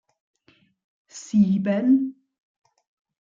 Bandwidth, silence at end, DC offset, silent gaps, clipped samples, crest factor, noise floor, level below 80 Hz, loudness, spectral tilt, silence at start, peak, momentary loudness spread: 7.6 kHz; 1.1 s; under 0.1%; none; under 0.1%; 16 dB; -62 dBFS; -68 dBFS; -22 LUFS; -7.5 dB/octave; 1.15 s; -8 dBFS; 19 LU